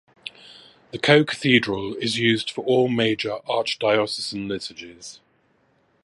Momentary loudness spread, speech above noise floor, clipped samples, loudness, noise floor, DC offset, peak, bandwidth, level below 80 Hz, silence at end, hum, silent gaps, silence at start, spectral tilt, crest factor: 21 LU; 42 dB; under 0.1%; -21 LUFS; -64 dBFS; under 0.1%; 0 dBFS; 11.5 kHz; -60 dBFS; 0.9 s; none; none; 0.25 s; -5 dB/octave; 22 dB